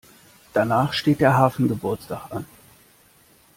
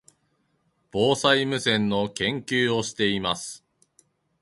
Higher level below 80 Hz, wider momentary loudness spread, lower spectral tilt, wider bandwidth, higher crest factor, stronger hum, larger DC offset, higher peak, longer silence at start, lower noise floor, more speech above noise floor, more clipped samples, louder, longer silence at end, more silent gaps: about the same, -56 dBFS vs -58 dBFS; first, 16 LU vs 11 LU; first, -6.5 dB/octave vs -4 dB/octave; first, 16.5 kHz vs 11.5 kHz; about the same, 20 dB vs 20 dB; neither; neither; about the same, -4 dBFS vs -6 dBFS; second, 0.55 s vs 0.95 s; second, -55 dBFS vs -70 dBFS; second, 35 dB vs 46 dB; neither; first, -21 LUFS vs -24 LUFS; first, 1.15 s vs 0.85 s; neither